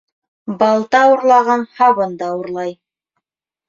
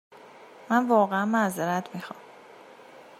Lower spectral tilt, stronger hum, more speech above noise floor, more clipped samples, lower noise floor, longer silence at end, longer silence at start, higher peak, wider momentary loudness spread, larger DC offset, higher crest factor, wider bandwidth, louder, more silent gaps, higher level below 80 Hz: about the same, -5.5 dB/octave vs -6 dB/octave; neither; first, 67 dB vs 24 dB; neither; first, -81 dBFS vs -49 dBFS; first, 0.95 s vs 0.45 s; about the same, 0.45 s vs 0.35 s; first, -2 dBFS vs -8 dBFS; second, 14 LU vs 18 LU; neither; about the same, 14 dB vs 18 dB; second, 7.6 kHz vs 15 kHz; first, -14 LUFS vs -25 LUFS; neither; first, -64 dBFS vs -80 dBFS